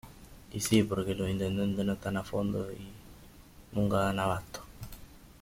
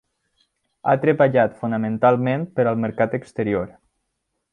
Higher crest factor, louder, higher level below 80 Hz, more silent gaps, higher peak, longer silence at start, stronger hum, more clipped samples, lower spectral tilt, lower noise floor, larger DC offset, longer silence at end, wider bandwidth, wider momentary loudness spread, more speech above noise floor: about the same, 20 dB vs 18 dB; second, -31 LUFS vs -20 LUFS; first, -52 dBFS vs -58 dBFS; neither; second, -12 dBFS vs -4 dBFS; second, 0.05 s vs 0.85 s; neither; neither; second, -5.5 dB/octave vs -9 dB/octave; second, -53 dBFS vs -76 dBFS; neither; second, 0.05 s vs 0.85 s; first, 16.5 kHz vs 9.8 kHz; first, 20 LU vs 9 LU; second, 23 dB vs 56 dB